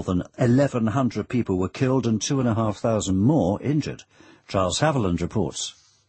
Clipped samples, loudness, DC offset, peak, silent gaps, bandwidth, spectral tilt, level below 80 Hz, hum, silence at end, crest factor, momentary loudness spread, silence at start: under 0.1%; -23 LUFS; under 0.1%; -6 dBFS; none; 8.8 kHz; -6 dB/octave; -48 dBFS; none; 0.35 s; 16 dB; 7 LU; 0 s